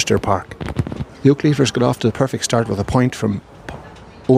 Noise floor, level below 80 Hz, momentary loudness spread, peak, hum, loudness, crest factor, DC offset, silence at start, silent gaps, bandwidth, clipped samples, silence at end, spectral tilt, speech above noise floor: -39 dBFS; -40 dBFS; 14 LU; 0 dBFS; none; -18 LUFS; 16 dB; under 0.1%; 0 s; none; 15.5 kHz; under 0.1%; 0 s; -6 dB/octave; 22 dB